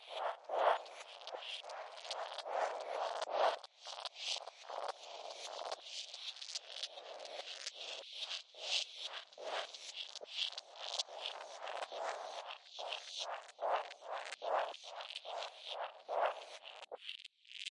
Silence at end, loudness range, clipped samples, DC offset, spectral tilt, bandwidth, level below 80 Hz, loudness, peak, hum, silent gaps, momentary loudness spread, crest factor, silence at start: 0.05 s; 4 LU; under 0.1%; under 0.1%; 3 dB/octave; 11.5 kHz; under -90 dBFS; -43 LUFS; -20 dBFS; none; none; 11 LU; 24 dB; 0 s